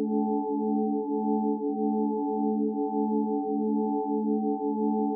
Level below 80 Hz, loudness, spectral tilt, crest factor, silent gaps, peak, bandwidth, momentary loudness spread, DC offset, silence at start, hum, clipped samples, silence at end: -88 dBFS; -28 LUFS; -0.5 dB/octave; 12 dB; none; -16 dBFS; 1 kHz; 1 LU; under 0.1%; 0 s; none; under 0.1%; 0 s